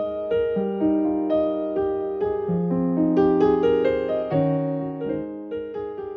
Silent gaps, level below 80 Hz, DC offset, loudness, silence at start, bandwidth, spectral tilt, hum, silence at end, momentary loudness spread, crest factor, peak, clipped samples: none; -52 dBFS; under 0.1%; -23 LUFS; 0 s; 5.6 kHz; -10 dB/octave; none; 0 s; 11 LU; 14 dB; -8 dBFS; under 0.1%